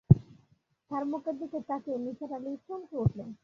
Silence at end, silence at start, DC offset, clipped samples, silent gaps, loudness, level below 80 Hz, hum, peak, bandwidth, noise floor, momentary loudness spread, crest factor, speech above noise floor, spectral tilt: 0.1 s; 0.1 s; under 0.1%; under 0.1%; none; -33 LUFS; -50 dBFS; none; -4 dBFS; 6 kHz; -69 dBFS; 12 LU; 26 dB; 35 dB; -11.5 dB/octave